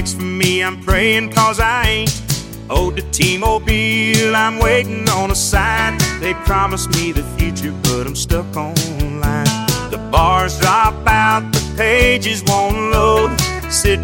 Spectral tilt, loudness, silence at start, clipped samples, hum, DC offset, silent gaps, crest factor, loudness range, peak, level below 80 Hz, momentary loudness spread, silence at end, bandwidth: -4 dB/octave; -15 LUFS; 0 s; under 0.1%; none; under 0.1%; none; 16 dB; 4 LU; 0 dBFS; -24 dBFS; 7 LU; 0 s; 17 kHz